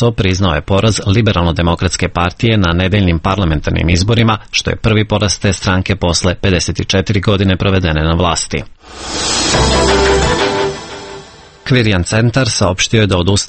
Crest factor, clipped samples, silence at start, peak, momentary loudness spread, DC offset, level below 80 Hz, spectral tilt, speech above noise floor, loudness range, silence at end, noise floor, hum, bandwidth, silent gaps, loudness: 12 dB; under 0.1%; 0 s; 0 dBFS; 6 LU; under 0.1%; -26 dBFS; -4.5 dB/octave; 23 dB; 1 LU; 0 s; -35 dBFS; none; 8.8 kHz; none; -13 LUFS